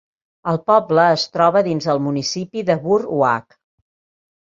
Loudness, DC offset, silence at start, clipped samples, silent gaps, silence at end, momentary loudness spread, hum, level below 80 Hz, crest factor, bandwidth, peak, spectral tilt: -18 LUFS; under 0.1%; 0.45 s; under 0.1%; none; 1 s; 8 LU; none; -62 dBFS; 16 dB; 7.8 kHz; -2 dBFS; -5.5 dB/octave